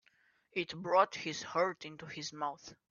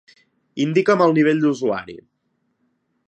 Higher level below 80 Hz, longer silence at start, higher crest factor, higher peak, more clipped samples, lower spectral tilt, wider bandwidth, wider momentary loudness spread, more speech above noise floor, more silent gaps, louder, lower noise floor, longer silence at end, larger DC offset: second, -78 dBFS vs -66 dBFS; about the same, 0.55 s vs 0.55 s; first, 22 dB vs 16 dB; second, -14 dBFS vs -4 dBFS; neither; second, -2.5 dB/octave vs -7 dB/octave; second, 7.2 kHz vs 8.4 kHz; about the same, 15 LU vs 16 LU; second, 36 dB vs 52 dB; neither; second, -35 LUFS vs -18 LUFS; about the same, -72 dBFS vs -70 dBFS; second, 0.2 s vs 1.1 s; neither